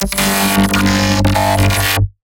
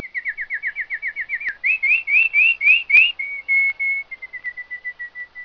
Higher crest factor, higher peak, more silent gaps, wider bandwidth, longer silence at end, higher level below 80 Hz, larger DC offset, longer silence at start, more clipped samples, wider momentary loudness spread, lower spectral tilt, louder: second, 12 dB vs 18 dB; about the same, -2 dBFS vs -2 dBFS; neither; first, 17.5 kHz vs 5.4 kHz; first, 0.25 s vs 0 s; first, -26 dBFS vs -60 dBFS; neither; about the same, 0 s vs 0 s; neither; second, 2 LU vs 17 LU; first, -4 dB/octave vs 0 dB/octave; first, -13 LUFS vs -16 LUFS